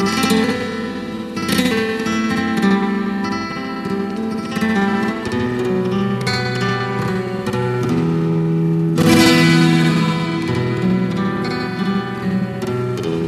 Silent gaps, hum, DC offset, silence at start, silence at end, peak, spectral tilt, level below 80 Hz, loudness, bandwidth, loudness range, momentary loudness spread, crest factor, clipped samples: none; none; under 0.1%; 0 s; 0 s; 0 dBFS; -6 dB/octave; -48 dBFS; -18 LUFS; 13.5 kHz; 5 LU; 9 LU; 16 dB; under 0.1%